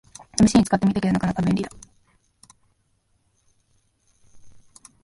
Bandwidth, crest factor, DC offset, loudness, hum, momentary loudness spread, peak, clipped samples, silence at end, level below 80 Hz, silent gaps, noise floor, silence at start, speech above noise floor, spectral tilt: 11.5 kHz; 22 dB; under 0.1%; -21 LUFS; none; 11 LU; -2 dBFS; under 0.1%; 0.55 s; -48 dBFS; none; -67 dBFS; 0.35 s; 47 dB; -6 dB/octave